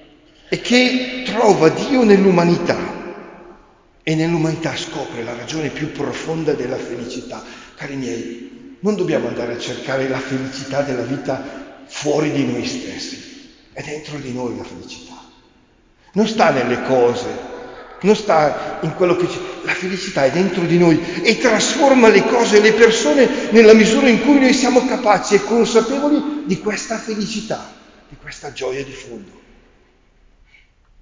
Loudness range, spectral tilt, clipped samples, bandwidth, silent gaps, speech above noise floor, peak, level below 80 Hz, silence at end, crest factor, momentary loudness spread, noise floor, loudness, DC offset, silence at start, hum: 13 LU; -5 dB/octave; under 0.1%; 7.6 kHz; none; 37 dB; 0 dBFS; -50 dBFS; 1.8 s; 18 dB; 19 LU; -53 dBFS; -16 LUFS; under 0.1%; 0.5 s; none